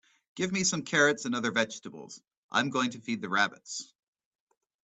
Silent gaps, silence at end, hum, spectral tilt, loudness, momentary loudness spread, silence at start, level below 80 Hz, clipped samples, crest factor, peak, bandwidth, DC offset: 2.37-2.49 s; 1 s; none; -3 dB/octave; -29 LUFS; 20 LU; 0.35 s; -72 dBFS; under 0.1%; 22 dB; -10 dBFS; 9.2 kHz; under 0.1%